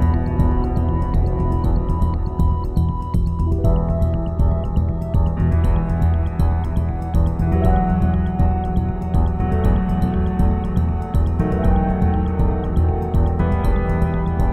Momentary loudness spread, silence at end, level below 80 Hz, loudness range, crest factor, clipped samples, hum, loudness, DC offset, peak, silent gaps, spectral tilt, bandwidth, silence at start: 3 LU; 0 s; -22 dBFS; 1 LU; 14 dB; under 0.1%; none; -20 LUFS; under 0.1%; -4 dBFS; none; -10 dB/octave; 4.3 kHz; 0 s